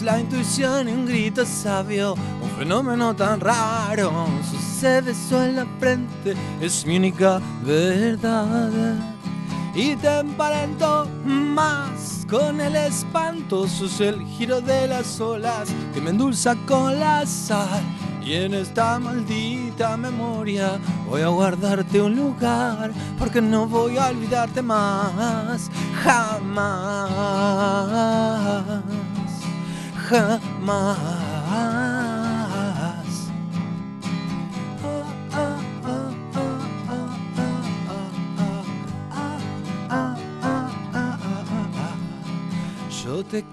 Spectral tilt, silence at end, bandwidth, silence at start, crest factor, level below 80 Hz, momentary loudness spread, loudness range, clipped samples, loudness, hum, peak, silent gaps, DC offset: -5.5 dB/octave; 0 s; 13 kHz; 0 s; 22 dB; -50 dBFS; 9 LU; 6 LU; under 0.1%; -23 LUFS; none; -2 dBFS; none; under 0.1%